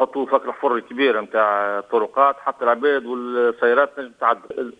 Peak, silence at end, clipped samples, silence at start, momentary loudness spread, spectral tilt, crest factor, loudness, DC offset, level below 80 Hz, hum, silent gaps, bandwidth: -2 dBFS; 0.1 s; under 0.1%; 0 s; 5 LU; -5.5 dB/octave; 18 dB; -20 LUFS; under 0.1%; -66 dBFS; none; none; 4.9 kHz